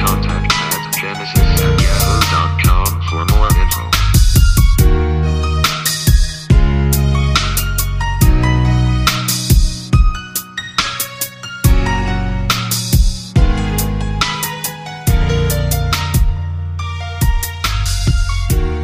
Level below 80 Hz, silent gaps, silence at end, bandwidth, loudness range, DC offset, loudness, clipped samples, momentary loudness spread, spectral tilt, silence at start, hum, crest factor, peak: -16 dBFS; none; 0 s; 15.5 kHz; 4 LU; under 0.1%; -15 LUFS; under 0.1%; 6 LU; -4.5 dB/octave; 0 s; none; 14 dB; 0 dBFS